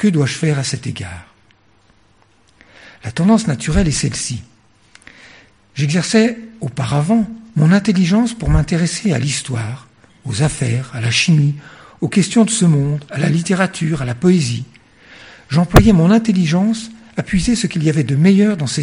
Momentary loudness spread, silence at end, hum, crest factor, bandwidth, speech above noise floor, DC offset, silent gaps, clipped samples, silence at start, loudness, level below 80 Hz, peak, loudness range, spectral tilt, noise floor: 14 LU; 0 s; none; 16 dB; 11 kHz; 39 dB; 0.1%; none; 0.1%; 0 s; -16 LUFS; -32 dBFS; 0 dBFS; 5 LU; -5.5 dB/octave; -54 dBFS